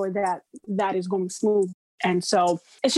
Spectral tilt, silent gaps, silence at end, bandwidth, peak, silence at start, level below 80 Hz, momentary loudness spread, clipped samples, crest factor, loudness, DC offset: -4.5 dB/octave; 1.74-1.98 s; 0 s; 12.5 kHz; -8 dBFS; 0 s; -72 dBFS; 7 LU; under 0.1%; 16 dB; -25 LUFS; under 0.1%